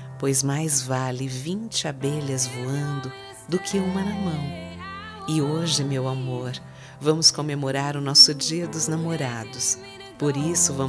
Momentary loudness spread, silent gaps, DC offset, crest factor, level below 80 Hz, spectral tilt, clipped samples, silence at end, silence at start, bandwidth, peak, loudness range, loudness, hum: 16 LU; none; under 0.1%; 24 dB; -58 dBFS; -3.5 dB/octave; under 0.1%; 0 s; 0 s; 11 kHz; 0 dBFS; 8 LU; -22 LUFS; none